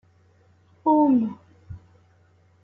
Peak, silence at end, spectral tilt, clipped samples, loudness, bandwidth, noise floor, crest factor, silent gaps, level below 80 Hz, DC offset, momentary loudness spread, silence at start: -8 dBFS; 0.85 s; -11 dB/octave; under 0.1%; -21 LUFS; 3.7 kHz; -59 dBFS; 18 dB; none; -60 dBFS; under 0.1%; 26 LU; 0.85 s